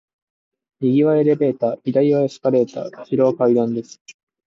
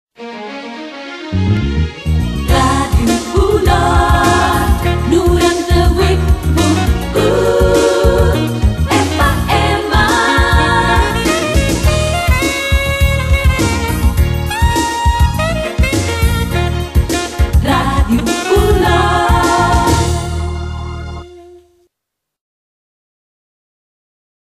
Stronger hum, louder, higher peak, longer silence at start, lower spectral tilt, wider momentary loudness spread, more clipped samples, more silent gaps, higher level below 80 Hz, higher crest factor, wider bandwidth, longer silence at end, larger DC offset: neither; second, -18 LUFS vs -13 LUFS; second, -4 dBFS vs 0 dBFS; first, 0.8 s vs 0.2 s; first, -8.5 dB/octave vs -5.5 dB/octave; about the same, 8 LU vs 7 LU; neither; first, 4.01-4.05 s vs none; second, -68 dBFS vs -18 dBFS; about the same, 14 dB vs 12 dB; second, 7.6 kHz vs 14.5 kHz; second, 0.35 s vs 2.85 s; neither